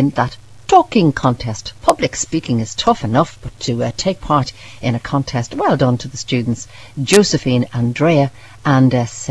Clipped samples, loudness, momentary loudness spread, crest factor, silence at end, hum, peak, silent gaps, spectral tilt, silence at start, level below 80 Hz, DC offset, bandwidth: under 0.1%; -16 LUFS; 10 LU; 16 dB; 0 s; none; 0 dBFS; none; -5.5 dB/octave; 0 s; -42 dBFS; 0.8%; 11 kHz